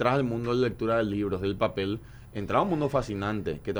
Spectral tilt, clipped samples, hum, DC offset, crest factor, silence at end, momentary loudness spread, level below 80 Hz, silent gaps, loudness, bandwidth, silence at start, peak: -7.5 dB/octave; under 0.1%; none; under 0.1%; 18 dB; 0 s; 7 LU; -50 dBFS; none; -28 LUFS; over 20 kHz; 0 s; -10 dBFS